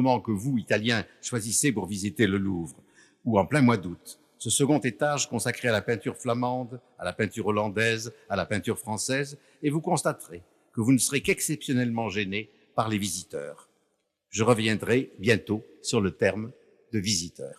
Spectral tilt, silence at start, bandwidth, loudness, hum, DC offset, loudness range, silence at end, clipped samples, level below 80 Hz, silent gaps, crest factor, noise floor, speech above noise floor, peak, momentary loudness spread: -4.5 dB/octave; 0 s; 15 kHz; -27 LUFS; none; under 0.1%; 3 LU; 0.05 s; under 0.1%; -64 dBFS; none; 20 dB; -75 dBFS; 48 dB; -8 dBFS; 13 LU